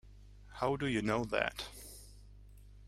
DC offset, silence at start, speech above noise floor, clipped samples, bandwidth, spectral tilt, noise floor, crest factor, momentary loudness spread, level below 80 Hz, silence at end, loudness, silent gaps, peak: under 0.1%; 0.05 s; 21 dB; under 0.1%; 16 kHz; -5 dB/octave; -55 dBFS; 24 dB; 20 LU; -56 dBFS; 0 s; -36 LUFS; none; -14 dBFS